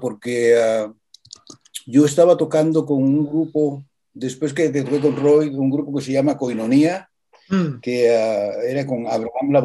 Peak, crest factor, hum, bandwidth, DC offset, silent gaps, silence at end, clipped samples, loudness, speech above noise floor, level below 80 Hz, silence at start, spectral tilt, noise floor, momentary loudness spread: -2 dBFS; 16 dB; none; 12.5 kHz; under 0.1%; none; 0 s; under 0.1%; -19 LUFS; 26 dB; -66 dBFS; 0 s; -6.5 dB/octave; -44 dBFS; 9 LU